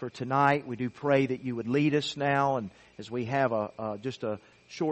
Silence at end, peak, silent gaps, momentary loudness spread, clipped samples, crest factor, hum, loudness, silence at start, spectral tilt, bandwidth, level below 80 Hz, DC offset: 0 s; -8 dBFS; none; 11 LU; under 0.1%; 20 dB; none; -29 LUFS; 0 s; -6.5 dB/octave; 8.4 kHz; -66 dBFS; under 0.1%